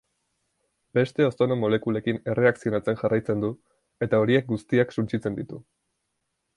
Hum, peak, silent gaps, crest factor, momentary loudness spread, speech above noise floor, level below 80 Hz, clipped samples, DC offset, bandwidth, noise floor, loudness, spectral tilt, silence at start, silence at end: none; -6 dBFS; none; 18 dB; 9 LU; 54 dB; -60 dBFS; under 0.1%; under 0.1%; 11 kHz; -78 dBFS; -25 LUFS; -8 dB/octave; 0.95 s; 0.95 s